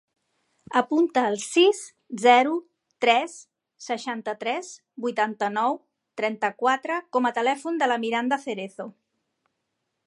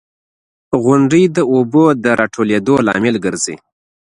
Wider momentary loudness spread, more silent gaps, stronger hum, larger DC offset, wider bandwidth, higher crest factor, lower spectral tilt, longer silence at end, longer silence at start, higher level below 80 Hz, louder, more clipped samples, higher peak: first, 15 LU vs 9 LU; neither; neither; neither; about the same, 11.5 kHz vs 11 kHz; first, 22 dB vs 14 dB; second, -3 dB/octave vs -5.5 dB/octave; first, 1.15 s vs 0.5 s; about the same, 0.7 s vs 0.7 s; second, -80 dBFS vs -52 dBFS; second, -24 LUFS vs -13 LUFS; neither; second, -4 dBFS vs 0 dBFS